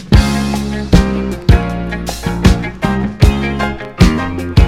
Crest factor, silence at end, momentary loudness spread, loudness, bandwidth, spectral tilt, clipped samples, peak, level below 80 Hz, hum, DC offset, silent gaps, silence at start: 12 dB; 0 s; 8 LU; -14 LUFS; 15.5 kHz; -6.5 dB/octave; 1%; 0 dBFS; -18 dBFS; none; under 0.1%; none; 0 s